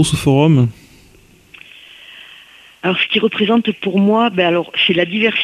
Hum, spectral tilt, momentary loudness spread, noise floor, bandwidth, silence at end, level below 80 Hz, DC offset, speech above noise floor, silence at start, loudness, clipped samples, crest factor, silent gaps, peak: none; -5.5 dB/octave; 15 LU; -47 dBFS; 14 kHz; 0 s; -46 dBFS; under 0.1%; 33 dB; 0 s; -14 LUFS; under 0.1%; 14 dB; none; -2 dBFS